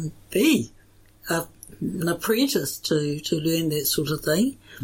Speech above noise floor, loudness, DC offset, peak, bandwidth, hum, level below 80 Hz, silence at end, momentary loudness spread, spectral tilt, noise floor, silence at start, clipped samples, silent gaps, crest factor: 27 dB; -24 LUFS; under 0.1%; -8 dBFS; 17 kHz; none; -54 dBFS; 0 s; 10 LU; -4.5 dB/octave; -51 dBFS; 0 s; under 0.1%; none; 16 dB